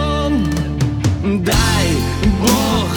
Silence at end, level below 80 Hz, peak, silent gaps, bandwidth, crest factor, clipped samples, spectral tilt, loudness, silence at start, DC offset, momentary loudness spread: 0 s; -24 dBFS; 0 dBFS; none; over 20 kHz; 16 dB; under 0.1%; -5 dB/octave; -16 LUFS; 0 s; under 0.1%; 4 LU